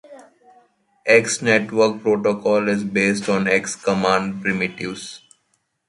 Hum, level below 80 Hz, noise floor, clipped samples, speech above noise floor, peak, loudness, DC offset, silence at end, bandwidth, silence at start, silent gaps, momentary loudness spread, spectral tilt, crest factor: none; -58 dBFS; -69 dBFS; under 0.1%; 50 dB; -2 dBFS; -19 LUFS; under 0.1%; 0.7 s; 11.5 kHz; 0.1 s; none; 11 LU; -4.5 dB/octave; 20 dB